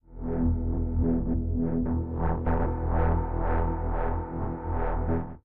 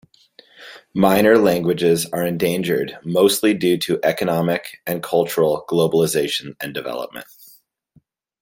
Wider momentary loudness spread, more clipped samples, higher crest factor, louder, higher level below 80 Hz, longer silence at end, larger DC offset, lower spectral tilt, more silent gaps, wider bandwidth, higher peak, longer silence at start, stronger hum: second, 5 LU vs 12 LU; neither; second, 12 dB vs 18 dB; second, -29 LUFS vs -19 LUFS; first, -32 dBFS vs -58 dBFS; second, 0 s vs 1.2 s; first, 1% vs under 0.1%; first, -10.5 dB/octave vs -5 dB/octave; neither; second, 3 kHz vs 17 kHz; second, -14 dBFS vs -2 dBFS; second, 0 s vs 0.6 s; neither